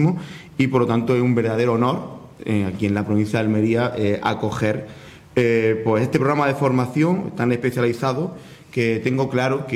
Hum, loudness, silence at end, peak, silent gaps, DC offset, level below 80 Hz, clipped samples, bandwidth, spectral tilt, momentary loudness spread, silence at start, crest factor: none; -20 LUFS; 0 s; -6 dBFS; none; under 0.1%; -54 dBFS; under 0.1%; 15.5 kHz; -7.5 dB/octave; 9 LU; 0 s; 14 dB